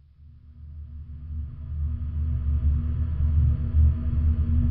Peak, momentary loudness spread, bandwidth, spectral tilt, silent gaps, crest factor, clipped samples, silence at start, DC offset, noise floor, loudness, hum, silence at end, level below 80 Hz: -10 dBFS; 18 LU; 1.9 kHz; -11.5 dB/octave; none; 14 dB; under 0.1%; 0.2 s; under 0.1%; -49 dBFS; -26 LUFS; none; 0 s; -26 dBFS